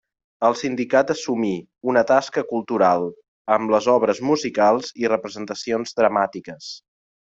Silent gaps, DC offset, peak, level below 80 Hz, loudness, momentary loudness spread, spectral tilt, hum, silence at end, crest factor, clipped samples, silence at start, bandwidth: 3.28-3.45 s; under 0.1%; -4 dBFS; -64 dBFS; -21 LUFS; 13 LU; -5 dB/octave; none; 0.45 s; 18 dB; under 0.1%; 0.4 s; 7.8 kHz